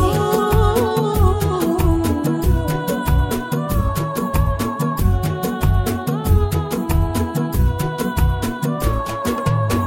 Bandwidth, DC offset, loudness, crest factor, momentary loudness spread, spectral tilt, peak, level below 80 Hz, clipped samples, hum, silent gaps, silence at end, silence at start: 16.5 kHz; under 0.1%; -19 LUFS; 14 dB; 5 LU; -6.5 dB/octave; -4 dBFS; -24 dBFS; under 0.1%; none; none; 0 s; 0 s